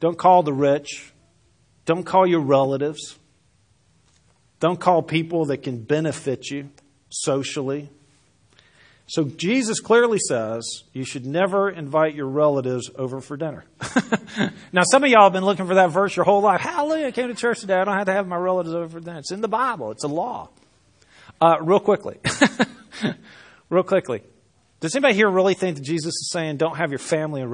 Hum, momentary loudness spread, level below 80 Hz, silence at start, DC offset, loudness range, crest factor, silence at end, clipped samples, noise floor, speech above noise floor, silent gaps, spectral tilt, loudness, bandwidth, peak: none; 13 LU; -66 dBFS; 0 s; under 0.1%; 8 LU; 22 dB; 0 s; under 0.1%; -61 dBFS; 41 dB; none; -4.5 dB/octave; -21 LUFS; 10.5 kHz; 0 dBFS